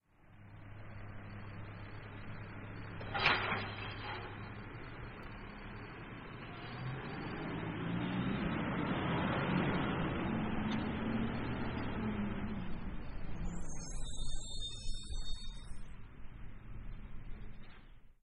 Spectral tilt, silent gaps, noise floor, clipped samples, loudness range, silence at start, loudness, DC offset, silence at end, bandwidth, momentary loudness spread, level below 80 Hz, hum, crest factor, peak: -5.5 dB/octave; none; -59 dBFS; under 0.1%; 11 LU; 0.25 s; -40 LUFS; under 0.1%; 0.1 s; 10.5 kHz; 18 LU; -48 dBFS; none; 24 dB; -14 dBFS